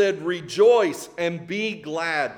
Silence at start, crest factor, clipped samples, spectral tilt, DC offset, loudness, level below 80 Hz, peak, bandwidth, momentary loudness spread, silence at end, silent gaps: 0 s; 16 dB; under 0.1%; -4.5 dB/octave; under 0.1%; -22 LUFS; -68 dBFS; -6 dBFS; 17 kHz; 11 LU; 0 s; none